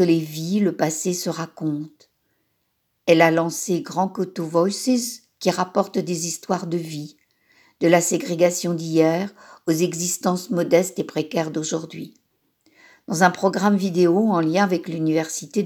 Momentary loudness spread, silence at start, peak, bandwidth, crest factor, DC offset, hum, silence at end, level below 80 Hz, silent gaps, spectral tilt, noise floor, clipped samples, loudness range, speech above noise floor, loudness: 10 LU; 0 s; 0 dBFS; over 20 kHz; 22 dB; under 0.1%; none; 0 s; -78 dBFS; none; -5 dB/octave; -72 dBFS; under 0.1%; 3 LU; 51 dB; -21 LUFS